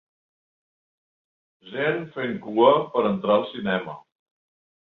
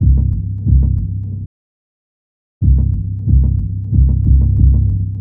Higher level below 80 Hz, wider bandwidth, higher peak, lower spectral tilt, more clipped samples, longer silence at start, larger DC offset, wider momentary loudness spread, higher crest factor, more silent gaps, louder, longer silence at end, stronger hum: second, -68 dBFS vs -16 dBFS; first, 4.3 kHz vs 1 kHz; second, -4 dBFS vs 0 dBFS; second, -8.5 dB/octave vs -15.5 dB/octave; neither; first, 1.65 s vs 0 s; neither; first, 15 LU vs 10 LU; first, 22 dB vs 14 dB; second, none vs 1.46-2.61 s; second, -23 LUFS vs -15 LUFS; first, 0.95 s vs 0 s; neither